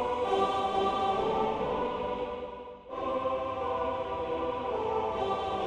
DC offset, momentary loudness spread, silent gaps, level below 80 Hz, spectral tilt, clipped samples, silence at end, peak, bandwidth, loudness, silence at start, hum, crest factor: under 0.1%; 8 LU; none; -54 dBFS; -6 dB/octave; under 0.1%; 0 s; -16 dBFS; 9.8 kHz; -31 LUFS; 0 s; none; 16 dB